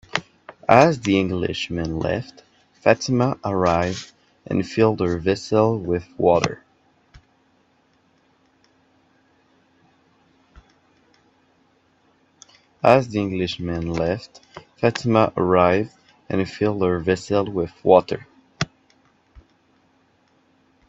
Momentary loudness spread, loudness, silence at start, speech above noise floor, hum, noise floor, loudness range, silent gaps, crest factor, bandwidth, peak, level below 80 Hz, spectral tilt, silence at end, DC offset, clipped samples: 13 LU; -21 LUFS; 0.15 s; 42 dB; none; -62 dBFS; 5 LU; none; 22 dB; 8.2 kHz; 0 dBFS; -52 dBFS; -6 dB/octave; 2.25 s; under 0.1%; under 0.1%